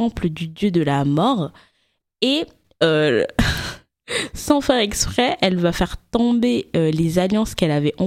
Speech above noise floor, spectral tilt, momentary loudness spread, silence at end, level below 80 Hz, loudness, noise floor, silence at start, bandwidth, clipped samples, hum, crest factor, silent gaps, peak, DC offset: 49 dB; -5 dB/octave; 7 LU; 0 s; -38 dBFS; -19 LUFS; -68 dBFS; 0 s; 16 kHz; under 0.1%; none; 20 dB; none; 0 dBFS; under 0.1%